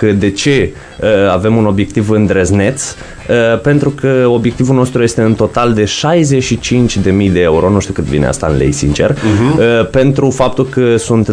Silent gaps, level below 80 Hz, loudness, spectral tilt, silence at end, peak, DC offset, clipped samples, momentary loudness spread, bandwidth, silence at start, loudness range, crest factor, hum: none; -30 dBFS; -11 LUFS; -6 dB/octave; 0 s; 0 dBFS; under 0.1%; under 0.1%; 4 LU; 10.5 kHz; 0 s; 1 LU; 10 dB; none